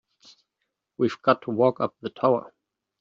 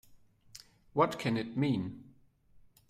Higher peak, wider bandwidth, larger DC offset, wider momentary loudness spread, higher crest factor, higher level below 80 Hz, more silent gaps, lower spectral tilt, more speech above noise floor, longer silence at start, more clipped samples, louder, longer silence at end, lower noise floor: first, -4 dBFS vs -12 dBFS; second, 7.4 kHz vs 15 kHz; neither; second, 6 LU vs 23 LU; about the same, 22 dB vs 22 dB; second, -74 dBFS vs -68 dBFS; neither; about the same, -5.5 dB/octave vs -6.5 dB/octave; first, 57 dB vs 30 dB; first, 1 s vs 0.1 s; neither; first, -24 LUFS vs -33 LUFS; second, 0.5 s vs 0.85 s; first, -81 dBFS vs -62 dBFS